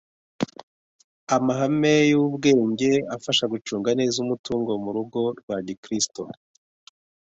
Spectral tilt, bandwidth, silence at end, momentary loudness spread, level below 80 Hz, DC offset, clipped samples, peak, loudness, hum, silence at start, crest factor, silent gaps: -4.5 dB/octave; 8.4 kHz; 0.95 s; 12 LU; -64 dBFS; under 0.1%; under 0.1%; -6 dBFS; -23 LUFS; none; 0.4 s; 18 dB; 0.63-1.27 s, 4.39-4.44 s, 5.43-5.48 s, 5.77-5.83 s